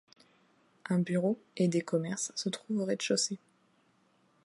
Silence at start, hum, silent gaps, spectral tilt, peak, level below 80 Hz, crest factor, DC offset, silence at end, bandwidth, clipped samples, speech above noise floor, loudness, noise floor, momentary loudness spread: 0.85 s; none; none; -4.5 dB/octave; -16 dBFS; -82 dBFS; 18 dB; under 0.1%; 1.05 s; 11.5 kHz; under 0.1%; 38 dB; -32 LUFS; -69 dBFS; 6 LU